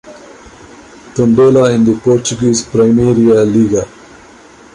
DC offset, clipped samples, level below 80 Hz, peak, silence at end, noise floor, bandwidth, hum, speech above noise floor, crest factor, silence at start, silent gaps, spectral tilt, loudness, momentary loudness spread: under 0.1%; under 0.1%; -42 dBFS; -2 dBFS; 0.9 s; -39 dBFS; 11 kHz; none; 29 dB; 10 dB; 0.05 s; none; -6 dB/octave; -10 LUFS; 7 LU